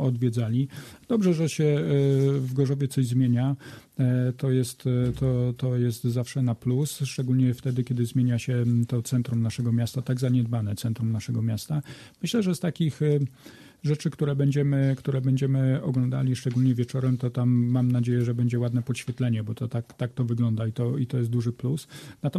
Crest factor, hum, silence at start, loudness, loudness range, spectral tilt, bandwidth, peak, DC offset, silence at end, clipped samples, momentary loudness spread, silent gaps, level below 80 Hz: 14 dB; none; 0 s; -26 LUFS; 3 LU; -7.5 dB/octave; 13.5 kHz; -12 dBFS; under 0.1%; 0 s; under 0.1%; 6 LU; none; -56 dBFS